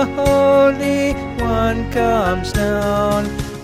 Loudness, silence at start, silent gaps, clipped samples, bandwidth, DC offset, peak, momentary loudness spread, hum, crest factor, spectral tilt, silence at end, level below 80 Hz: -17 LUFS; 0 s; none; under 0.1%; 15.5 kHz; under 0.1%; -4 dBFS; 8 LU; none; 12 dB; -6 dB/octave; 0 s; -30 dBFS